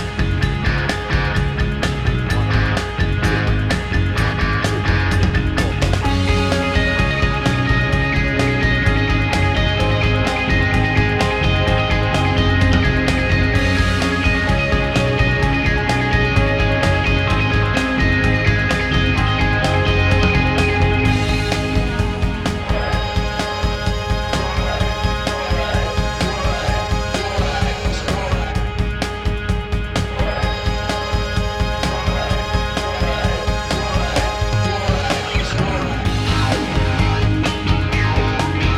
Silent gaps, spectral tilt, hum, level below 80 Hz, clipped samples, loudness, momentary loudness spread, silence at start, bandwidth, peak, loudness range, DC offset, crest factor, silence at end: none; -5.5 dB/octave; none; -24 dBFS; under 0.1%; -18 LUFS; 5 LU; 0 s; 13 kHz; -2 dBFS; 4 LU; 0.7%; 14 dB; 0 s